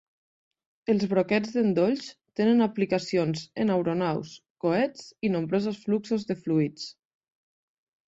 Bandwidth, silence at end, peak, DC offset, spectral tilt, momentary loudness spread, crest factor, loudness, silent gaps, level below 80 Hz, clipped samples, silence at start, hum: 8 kHz; 1.2 s; -10 dBFS; under 0.1%; -7 dB/octave; 9 LU; 18 dB; -27 LUFS; 4.50-4.55 s; -66 dBFS; under 0.1%; 0.9 s; none